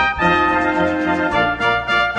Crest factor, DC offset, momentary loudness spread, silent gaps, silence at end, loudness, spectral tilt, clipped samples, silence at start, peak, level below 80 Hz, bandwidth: 14 dB; under 0.1%; 3 LU; none; 0 s; -16 LUFS; -5.5 dB/octave; under 0.1%; 0 s; -2 dBFS; -38 dBFS; 9.8 kHz